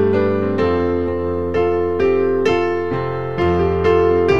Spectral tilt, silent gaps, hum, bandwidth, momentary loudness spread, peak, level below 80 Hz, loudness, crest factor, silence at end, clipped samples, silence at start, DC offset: -8 dB/octave; none; none; 7.4 kHz; 6 LU; -2 dBFS; -38 dBFS; -17 LUFS; 14 dB; 0 s; under 0.1%; 0 s; 2%